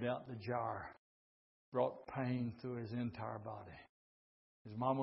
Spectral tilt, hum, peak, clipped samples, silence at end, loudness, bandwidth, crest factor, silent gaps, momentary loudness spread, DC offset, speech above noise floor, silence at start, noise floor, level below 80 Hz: -6.5 dB/octave; none; -24 dBFS; under 0.1%; 0 s; -43 LUFS; 5.6 kHz; 20 dB; 0.98-1.72 s, 3.89-4.65 s; 14 LU; under 0.1%; over 49 dB; 0 s; under -90 dBFS; -74 dBFS